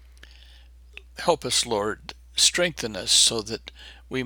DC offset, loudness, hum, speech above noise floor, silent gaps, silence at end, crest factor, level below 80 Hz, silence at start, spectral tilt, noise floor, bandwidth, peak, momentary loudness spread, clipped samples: under 0.1%; -22 LUFS; none; 24 dB; none; 0 s; 22 dB; -50 dBFS; 0.5 s; -1 dB/octave; -49 dBFS; over 20 kHz; -4 dBFS; 18 LU; under 0.1%